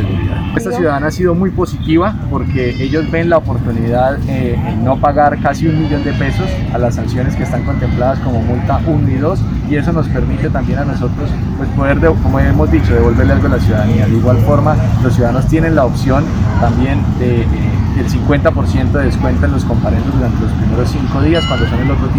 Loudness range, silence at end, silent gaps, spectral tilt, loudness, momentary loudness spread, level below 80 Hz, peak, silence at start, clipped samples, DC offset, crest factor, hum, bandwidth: 3 LU; 0 s; none; -8 dB/octave; -13 LUFS; 5 LU; -22 dBFS; 0 dBFS; 0 s; under 0.1%; 0.1%; 12 dB; none; 14.5 kHz